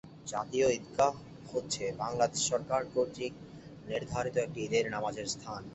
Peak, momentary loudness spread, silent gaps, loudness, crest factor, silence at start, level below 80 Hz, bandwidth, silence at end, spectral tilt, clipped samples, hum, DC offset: -14 dBFS; 10 LU; none; -33 LUFS; 20 dB; 0.05 s; -62 dBFS; 8.6 kHz; 0 s; -3.5 dB/octave; under 0.1%; none; under 0.1%